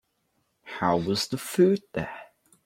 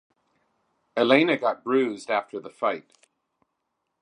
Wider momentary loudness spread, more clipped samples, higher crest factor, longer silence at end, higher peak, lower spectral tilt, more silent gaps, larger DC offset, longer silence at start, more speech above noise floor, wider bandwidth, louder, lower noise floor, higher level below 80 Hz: first, 16 LU vs 13 LU; neither; second, 18 dB vs 24 dB; second, 0.4 s vs 1.2 s; second, -10 dBFS vs -4 dBFS; about the same, -5.5 dB/octave vs -5.5 dB/octave; neither; neither; second, 0.65 s vs 0.95 s; second, 48 dB vs 55 dB; first, 16.5 kHz vs 10.5 kHz; about the same, -26 LUFS vs -24 LUFS; second, -73 dBFS vs -79 dBFS; first, -62 dBFS vs -82 dBFS